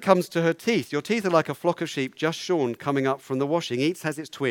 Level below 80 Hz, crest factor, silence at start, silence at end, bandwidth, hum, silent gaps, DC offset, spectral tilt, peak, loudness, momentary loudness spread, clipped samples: -74 dBFS; 22 dB; 0 s; 0 s; 18 kHz; none; none; under 0.1%; -5.5 dB/octave; -2 dBFS; -25 LUFS; 6 LU; under 0.1%